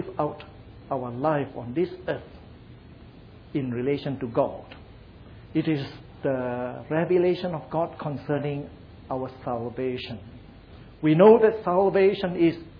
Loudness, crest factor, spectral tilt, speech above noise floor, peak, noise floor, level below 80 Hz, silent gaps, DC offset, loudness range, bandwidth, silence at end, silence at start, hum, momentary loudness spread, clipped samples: -25 LUFS; 22 dB; -10 dB/octave; 23 dB; -4 dBFS; -47 dBFS; -54 dBFS; none; under 0.1%; 9 LU; 5.2 kHz; 0 s; 0 s; none; 15 LU; under 0.1%